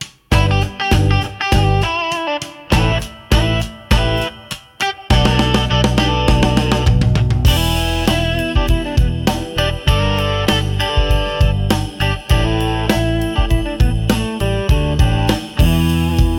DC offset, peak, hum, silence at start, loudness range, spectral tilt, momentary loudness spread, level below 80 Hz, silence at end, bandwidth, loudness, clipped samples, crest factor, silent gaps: under 0.1%; -2 dBFS; none; 0 s; 2 LU; -5.5 dB/octave; 5 LU; -20 dBFS; 0 s; 17 kHz; -16 LUFS; under 0.1%; 14 dB; none